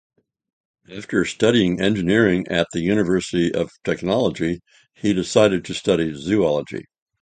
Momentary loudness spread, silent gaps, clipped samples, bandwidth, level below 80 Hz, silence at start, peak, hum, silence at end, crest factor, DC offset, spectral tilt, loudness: 9 LU; none; under 0.1%; 9.4 kHz; -48 dBFS; 0.9 s; -2 dBFS; none; 0.4 s; 20 dB; under 0.1%; -5.5 dB/octave; -20 LUFS